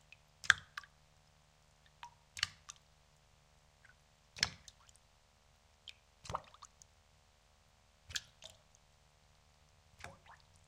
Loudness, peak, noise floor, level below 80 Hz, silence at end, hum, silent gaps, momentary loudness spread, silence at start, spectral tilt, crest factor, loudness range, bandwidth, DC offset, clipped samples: -38 LUFS; -8 dBFS; -69 dBFS; -68 dBFS; 0.35 s; none; none; 29 LU; 0.45 s; 0 dB/octave; 40 dB; 13 LU; 16 kHz; under 0.1%; under 0.1%